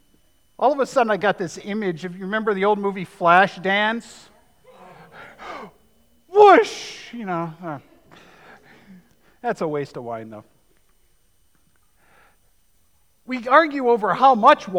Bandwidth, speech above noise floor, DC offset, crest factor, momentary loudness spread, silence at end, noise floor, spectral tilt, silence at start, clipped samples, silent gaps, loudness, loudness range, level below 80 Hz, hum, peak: 12.5 kHz; 44 dB; under 0.1%; 20 dB; 20 LU; 0 s; -64 dBFS; -5 dB/octave; 0.6 s; under 0.1%; none; -19 LUFS; 12 LU; -66 dBFS; none; -2 dBFS